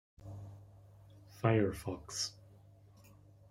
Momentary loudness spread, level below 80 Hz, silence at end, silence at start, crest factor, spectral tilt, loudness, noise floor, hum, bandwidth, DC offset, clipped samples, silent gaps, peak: 23 LU; -64 dBFS; 0.45 s; 0.2 s; 24 dB; -5 dB/octave; -36 LUFS; -60 dBFS; none; 16 kHz; under 0.1%; under 0.1%; none; -14 dBFS